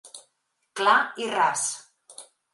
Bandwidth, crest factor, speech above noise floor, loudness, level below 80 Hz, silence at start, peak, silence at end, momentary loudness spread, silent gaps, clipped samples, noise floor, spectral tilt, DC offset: 12 kHz; 22 dB; 51 dB; -23 LUFS; -86 dBFS; 0.05 s; -6 dBFS; 0.3 s; 25 LU; none; under 0.1%; -74 dBFS; -0.5 dB/octave; under 0.1%